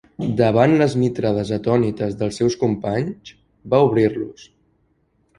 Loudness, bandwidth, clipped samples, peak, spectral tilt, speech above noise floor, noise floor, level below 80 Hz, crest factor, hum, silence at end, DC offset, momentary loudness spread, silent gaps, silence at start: -19 LUFS; 11 kHz; under 0.1%; -2 dBFS; -7.5 dB/octave; 45 dB; -63 dBFS; -50 dBFS; 18 dB; none; 0.95 s; under 0.1%; 9 LU; none; 0.2 s